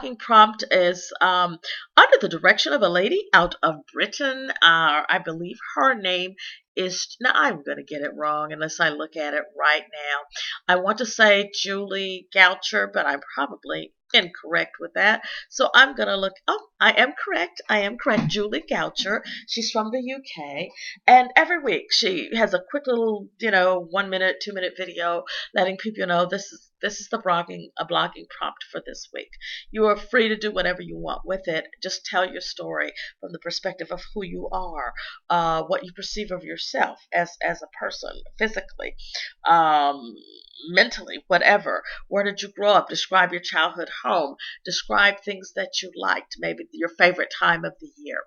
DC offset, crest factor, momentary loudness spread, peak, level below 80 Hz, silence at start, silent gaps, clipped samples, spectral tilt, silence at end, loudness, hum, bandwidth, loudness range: under 0.1%; 22 dB; 15 LU; 0 dBFS; -50 dBFS; 0 s; 6.68-6.75 s; under 0.1%; -3 dB/octave; 0.05 s; -22 LUFS; none; 7.4 kHz; 8 LU